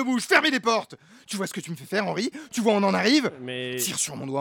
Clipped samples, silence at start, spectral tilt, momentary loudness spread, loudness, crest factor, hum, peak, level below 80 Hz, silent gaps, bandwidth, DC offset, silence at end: under 0.1%; 0 s; -3.5 dB/octave; 12 LU; -24 LUFS; 20 dB; none; -6 dBFS; -72 dBFS; none; 19 kHz; under 0.1%; 0 s